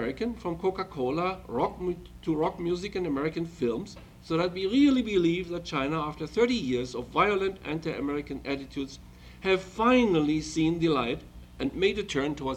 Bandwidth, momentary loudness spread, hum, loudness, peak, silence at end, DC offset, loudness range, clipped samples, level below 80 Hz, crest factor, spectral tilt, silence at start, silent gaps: 12.5 kHz; 11 LU; 60 Hz at -55 dBFS; -28 LUFS; -10 dBFS; 0 s; under 0.1%; 4 LU; under 0.1%; -50 dBFS; 18 dB; -6 dB/octave; 0 s; none